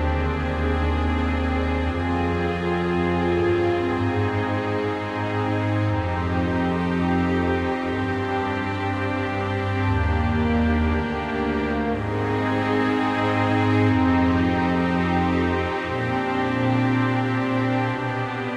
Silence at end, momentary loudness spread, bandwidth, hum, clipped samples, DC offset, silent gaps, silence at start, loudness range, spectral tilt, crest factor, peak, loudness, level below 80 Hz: 0 s; 4 LU; 9.8 kHz; none; under 0.1%; under 0.1%; none; 0 s; 3 LU; -8 dB/octave; 14 dB; -8 dBFS; -23 LUFS; -34 dBFS